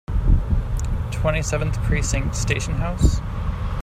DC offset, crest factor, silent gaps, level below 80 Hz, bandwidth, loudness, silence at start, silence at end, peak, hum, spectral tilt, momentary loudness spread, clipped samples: under 0.1%; 18 dB; none; -24 dBFS; 14 kHz; -23 LUFS; 0.1 s; 0 s; -2 dBFS; none; -5.5 dB/octave; 5 LU; under 0.1%